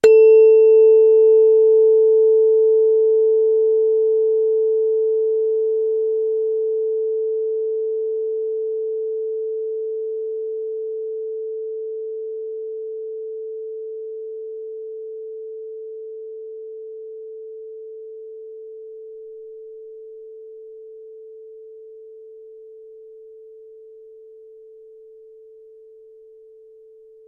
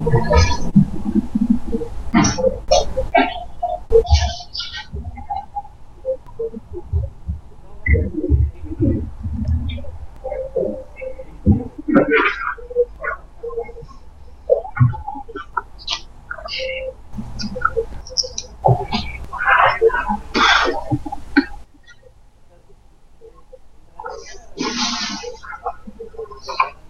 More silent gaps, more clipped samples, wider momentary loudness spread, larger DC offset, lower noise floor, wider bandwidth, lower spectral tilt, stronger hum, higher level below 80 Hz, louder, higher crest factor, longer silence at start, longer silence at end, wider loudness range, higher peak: neither; neither; first, 25 LU vs 17 LU; neither; about the same, -47 dBFS vs -46 dBFS; second, 7.6 kHz vs 10 kHz; about the same, -4.5 dB/octave vs -5 dB/octave; neither; second, -72 dBFS vs -28 dBFS; first, -17 LUFS vs -20 LUFS; about the same, 16 dB vs 20 dB; about the same, 0.05 s vs 0 s; first, 3.7 s vs 0 s; first, 25 LU vs 10 LU; about the same, -2 dBFS vs 0 dBFS